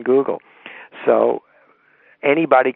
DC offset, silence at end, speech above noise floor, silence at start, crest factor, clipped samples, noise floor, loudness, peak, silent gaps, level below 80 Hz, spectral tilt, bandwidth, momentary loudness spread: under 0.1%; 0.05 s; 39 dB; 0 s; 18 dB; under 0.1%; -55 dBFS; -18 LUFS; 0 dBFS; none; -74 dBFS; -4 dB/octave; 4 kHz; 22 LU